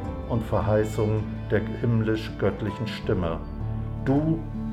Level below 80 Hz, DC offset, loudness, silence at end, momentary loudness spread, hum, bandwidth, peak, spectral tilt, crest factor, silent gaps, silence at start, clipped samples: -38 dBFS; under 0.1%; -27 LUFS; 0 s; 7 LU; none; 13 kHz; -10 dBFS; -8 dB/octave; 16 dB; none; 0 s; under 0.1%